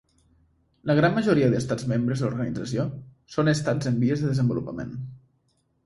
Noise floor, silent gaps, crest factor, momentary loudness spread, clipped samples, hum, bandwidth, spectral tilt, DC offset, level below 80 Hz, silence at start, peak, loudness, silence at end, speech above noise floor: -69 dBFS; none; 18 dB; 13 LU; under 0.1%; none; 11.5 kHz; -7 dB/octave; under 0.1%; -54 dBFS; 0.85 s; -8 dBFS; -25 LUFS; 0.7 s; 45 dB